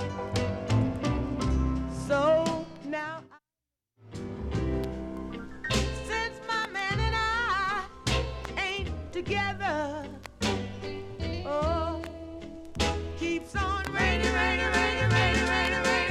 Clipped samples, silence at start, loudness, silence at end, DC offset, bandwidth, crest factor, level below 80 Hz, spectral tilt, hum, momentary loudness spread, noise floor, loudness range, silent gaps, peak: under 0.1%; 0 s; -29 LUFS; 0 s; under 0.1%; 13.5 kHz; 18 dB; -38 dBFS; -5 dB/octave; none; 13 LU; -89 dBFS; 6 LU; none; -12 dBFS